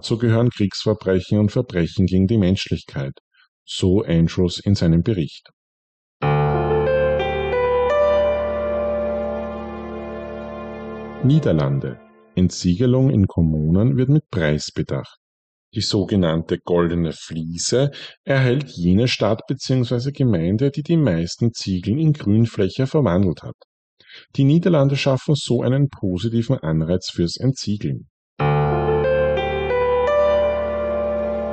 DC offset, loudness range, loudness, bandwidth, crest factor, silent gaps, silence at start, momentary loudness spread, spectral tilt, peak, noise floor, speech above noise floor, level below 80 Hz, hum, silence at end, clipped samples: under 0.1%; 3 LU; -20 LUFS; 9 kHz; 12 dB; 3.20-3.31 s, 3.48-3.66 s, 5.53-6.20 s, 15.17-15.72 s, 18.17-18.24 s, 23.54-23.97 s, 28.10-28.36 s; 0.05 s; 11 LU; -6.5 dB/octave; -6 dBFS; under -90 dBFS; over 71 dB; -40 dBFS; none; 0 s; under 0.1%